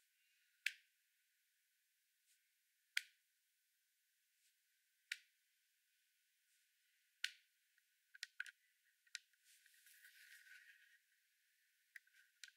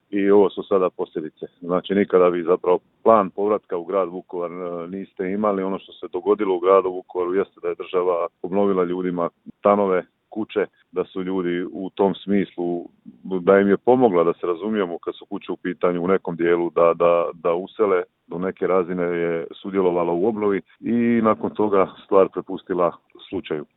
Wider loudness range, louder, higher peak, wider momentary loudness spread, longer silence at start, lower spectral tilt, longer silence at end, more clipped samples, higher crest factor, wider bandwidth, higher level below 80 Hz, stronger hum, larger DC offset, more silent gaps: first, 10 LU vs 3 LU; second, -51 LUFS vs -21 LUFS; second, -20 dBFS vs 0 dBFS; first, 20 LU vs 12 LU; first, 0.65 s vs 0.1 s; second, 7 dB/octave vs -11 dB/octave; about the same, 0.05 s vs 0.15 s; neither; first, 40 dB vs 20 dB; first, 16 kHz vs 4.1 kHz; second, under -90 dBFS vs -64 dBFS; neither; neither; neither